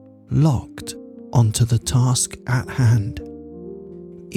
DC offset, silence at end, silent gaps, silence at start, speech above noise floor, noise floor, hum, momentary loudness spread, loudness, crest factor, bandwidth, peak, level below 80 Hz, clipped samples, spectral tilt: under 0.1%; 0 s; none; 0.3 s; 19 dB; -38 dBFS; none; 19 LU; -20 LUFS; 16 dB; 14.5 kHz; -6 dBFS; -44 dBFS; under 0.1%; -5.5 dB/octave